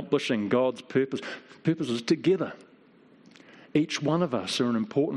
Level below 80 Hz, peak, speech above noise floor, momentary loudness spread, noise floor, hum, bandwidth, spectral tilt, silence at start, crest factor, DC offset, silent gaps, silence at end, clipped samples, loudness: -72 dBFS; -10 dBFS; 30 dB; 7 LU; -57 dBFS; none; 12 kHz; -5.5 dB/octave; 0 s; 18 dB; under 0.1%; none; 0 s; under 0.1%; -27 LUFS